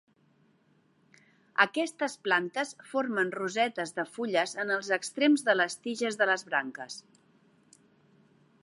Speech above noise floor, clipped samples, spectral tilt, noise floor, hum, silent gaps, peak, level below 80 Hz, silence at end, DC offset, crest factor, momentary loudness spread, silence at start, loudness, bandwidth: 38 dB; under 0.1%; -3 dB/octave; -67 dBFS; none; none; -8 dBFS; -88 dBFS; 1.65 s; under 0.1%; 24 dB; 9 LU; 1.6 s; -29 LUFS; 11.5 kHz